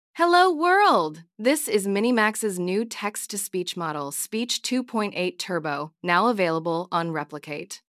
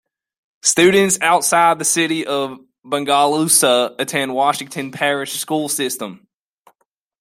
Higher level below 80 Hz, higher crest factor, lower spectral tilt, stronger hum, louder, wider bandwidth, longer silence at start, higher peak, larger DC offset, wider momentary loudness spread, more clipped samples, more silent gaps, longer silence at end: second, -84 dBFS vs -62 dBFS; about the same, 18 dB vs 18 dB; about the same, -3.5 dB/octave vs -2.5 dB/octave; neither; second, -24 LUFS vs -16 LUFS; about the same, 16 kHz vs 16 kHz; second, 0.15 s vs 0.65 s; second, -6 dBFS vs 0 dBFS; neither; about the same, 11 LU vs 11 LU; neither; neither; second, 0.2 s vs 1.05 s